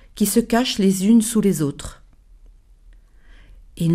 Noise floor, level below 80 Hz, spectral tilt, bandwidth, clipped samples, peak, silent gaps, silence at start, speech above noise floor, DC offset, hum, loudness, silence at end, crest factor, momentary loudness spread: -48 dBFS; -44 dBFS; -5 dB/octave; 15.5 kHz; under 0.1%; -4 dBFS; none; 0.15 s; 30 dB; under 0.1%; none; -18 LUFS; 0 s; 18 dB; 11 LU